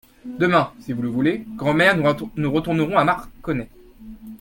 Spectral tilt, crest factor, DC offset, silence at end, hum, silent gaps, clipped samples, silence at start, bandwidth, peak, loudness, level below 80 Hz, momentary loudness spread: -7 dB/octave; 18 dB; under 0.1%; 0.05 s; none; none; under 0.1%; 0.25 s; 17 kHz; -2 dBFS; -21 LUFS; -48 dBFS; 14 LU